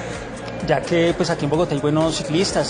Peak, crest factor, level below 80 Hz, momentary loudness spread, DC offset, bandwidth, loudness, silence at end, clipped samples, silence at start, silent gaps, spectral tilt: -4 dBFS; 16 dB; -42 dBFS; 11 LU; under 0.1%; 10 kHz; -20 LUFS; 0 s; under 0.1%; 0 s; none; -5 dB/octave